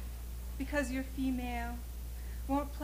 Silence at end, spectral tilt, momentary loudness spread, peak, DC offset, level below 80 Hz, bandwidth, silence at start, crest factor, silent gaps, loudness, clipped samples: 0 s; -6 dB/octave; 10 LU; -22 dBFS; under 0.1%; -42 dBFS; 16.5 kHz; 0 s; 16 dB; none; -38 LUFS; under 0.1%